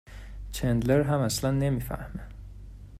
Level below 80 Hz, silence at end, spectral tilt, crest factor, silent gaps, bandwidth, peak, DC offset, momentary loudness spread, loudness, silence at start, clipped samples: -42 dBFS; 0 s; -6 dB/octave; 20 dB; none; 16 kHz; -10 dBFS; under 0.1%; 22 LU; -27 LUFS; 0.05 s; under 0.1%